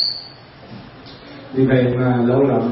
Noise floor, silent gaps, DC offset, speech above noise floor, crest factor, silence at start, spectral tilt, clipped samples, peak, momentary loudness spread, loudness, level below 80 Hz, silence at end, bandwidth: -38 dBFS; none; under 0.1%; 22 dB; 16 dB; 0 s; -12 dB/octave; under 0.1%; -4 dBFS; 23 LU; -17 LUFS; -50 dBFS; 0 s; 5.8 kHz